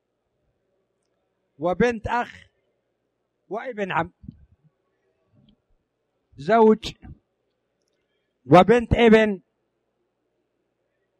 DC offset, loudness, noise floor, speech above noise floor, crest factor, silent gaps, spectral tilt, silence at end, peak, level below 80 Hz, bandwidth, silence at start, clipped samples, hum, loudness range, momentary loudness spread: under 0.1%; -19 LUFS; -75 dBFS; 56 dB; 22 dB; none; -7 dB/octave; 1.85 s; -2 dBFS; -46 dBFS; 9.4 kHz; 1.6 s; under 0.1%; none; 14 LU; 19 LU